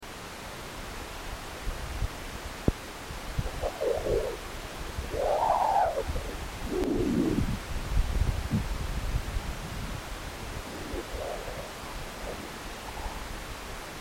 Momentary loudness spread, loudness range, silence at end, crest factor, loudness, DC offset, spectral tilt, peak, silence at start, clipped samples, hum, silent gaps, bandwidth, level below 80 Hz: 12 LU; 8 LU; 0 s; 22 dB; -33 LUFS; under 0.1%; -5.5 dB/octave; -10 dBFS; 0 s; under 0.1%; none; none; 16.5 kHz; -36 dBFS